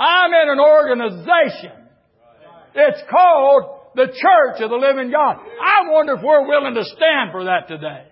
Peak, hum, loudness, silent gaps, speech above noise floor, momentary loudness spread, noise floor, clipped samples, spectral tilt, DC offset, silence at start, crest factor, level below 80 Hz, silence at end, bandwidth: -2 dBFS; none; -15 LUFS; none; 38 dB; 9 LU; -53 dBFS; under 0.1%; -9 dB/octave; under 0.1%; 0 s; 12 dB; -70 dBFS; 0.15 s; 5.8 kHz